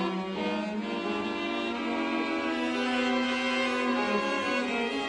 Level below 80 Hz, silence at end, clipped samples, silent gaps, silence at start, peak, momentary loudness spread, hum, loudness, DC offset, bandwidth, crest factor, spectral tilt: -64 dBFS; 0 s; under 0.1%; none; 0 s; -16 dBFS; 4 LU; none; -29 LUFS; under 0.1%; 10.5 kHz; 14 dB; -4.5 dB/octave